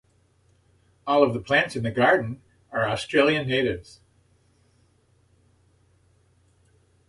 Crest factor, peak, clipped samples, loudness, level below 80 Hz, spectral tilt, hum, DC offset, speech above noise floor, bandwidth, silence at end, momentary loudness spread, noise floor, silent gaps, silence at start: 22 dB; -6 dBFS; under 0.1%; -23 LUFS; -56 dBFS; -5.5 dB/octave; none; under 0.1%; 40 dB; 11.5 kHz; 3.3 s; 15 LU; -63 dBFS; none; 1.05 s